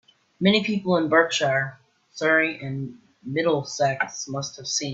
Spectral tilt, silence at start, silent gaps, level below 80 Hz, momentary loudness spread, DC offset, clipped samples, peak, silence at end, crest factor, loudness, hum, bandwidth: -4 dB/octave; 0.4 s; none; -66 dBFS; 13 LU; under 0.1%; under 0.1%; -4 dBFS; 0 s; 20 dB; -23 LUFS; none; 8 kHz